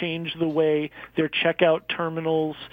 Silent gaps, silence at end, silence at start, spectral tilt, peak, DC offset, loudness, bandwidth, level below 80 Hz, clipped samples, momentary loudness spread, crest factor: none; 0.05 s; 0 s; -8 dB/octave; -8 dBFS; under 0.1%; -24 LUFS; 5 kHz; -62 dBFS; under 0.1%; 7 LU; 18 dB